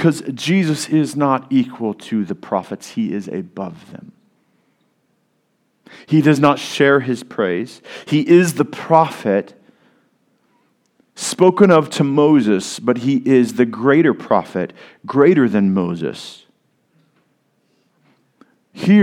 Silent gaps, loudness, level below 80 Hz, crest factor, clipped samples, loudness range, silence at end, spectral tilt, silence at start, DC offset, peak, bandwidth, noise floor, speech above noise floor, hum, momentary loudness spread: none; -16 LUFS; -66 dBFS; 18 dB; under 0.1%; 11 LU; 0 s; -6 dB/octave; 0 s; under 0.1%; 0 dBFS; 16 kHz; -65 dBFS; 49 dB; none; 14 LU